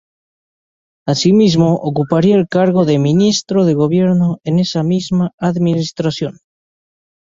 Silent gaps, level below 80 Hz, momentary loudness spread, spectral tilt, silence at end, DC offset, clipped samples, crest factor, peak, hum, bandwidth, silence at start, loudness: 5.33-5.38 s; -52 dBFS; 8 LU; -6.5 dB/octave; 0.9 s; under 0.1%; under 0.1%; 14 dB; 0 dBFS; none; 7.6 kHz; 1.05 s; -14 LUFS